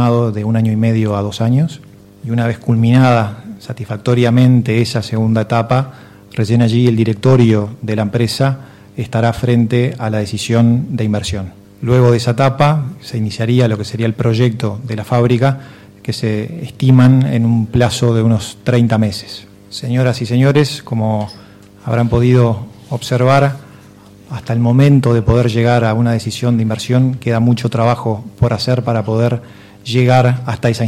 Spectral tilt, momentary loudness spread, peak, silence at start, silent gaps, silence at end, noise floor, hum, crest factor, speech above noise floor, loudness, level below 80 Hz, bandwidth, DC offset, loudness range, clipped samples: -7 dB/octave; 13 LU; 0 dBFS; 0 s; none; 0 s; -40 dBFS; none; 12 dB; 27 dB; -14 LUFS; -40 dBFS; 12.5 kHz; under 0.1%; 3 LU; under 0.1%